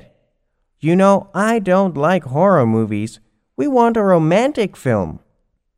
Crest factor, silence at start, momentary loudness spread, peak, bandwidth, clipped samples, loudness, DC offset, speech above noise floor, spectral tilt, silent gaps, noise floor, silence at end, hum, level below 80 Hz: 16 dB; 0.85 s; 10 LU; 0 dBFS; 15 kHz; under 0.1%; -16 LUFS; under 0.1%; 52 dB; -7.5 dB/octave; none; -67 dBFS; 0.65 s; none; -50 dBFS